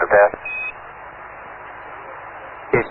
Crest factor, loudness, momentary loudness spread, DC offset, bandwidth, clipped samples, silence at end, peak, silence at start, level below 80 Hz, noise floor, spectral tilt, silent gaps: 20 dB; -19 LUFS; 21 LU; under 0.1%; 4.1 kHz; under 0.1%; 0 s; -2 dBFS; 0 s; -50 dBFS; -37 dBFS; -11 dB/octave; none